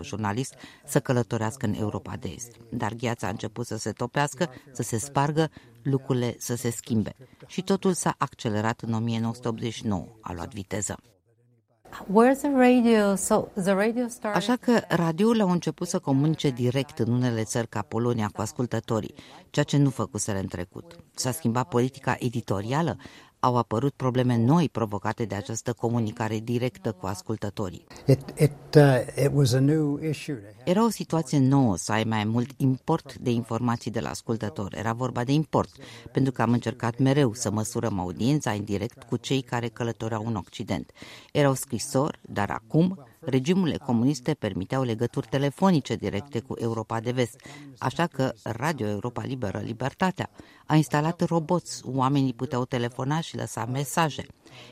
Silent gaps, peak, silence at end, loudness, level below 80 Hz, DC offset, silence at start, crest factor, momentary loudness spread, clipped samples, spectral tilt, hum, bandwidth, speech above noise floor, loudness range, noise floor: none; -2 dBFS; 0 s; -26 LUFS; -58 dBFS; under 0.1%; 0 s; 24 dB; 10 LU; under 0.1%; -6 dB/octave; none; 15.5 kHz; 39 dB; 6 LU; -65 dBFS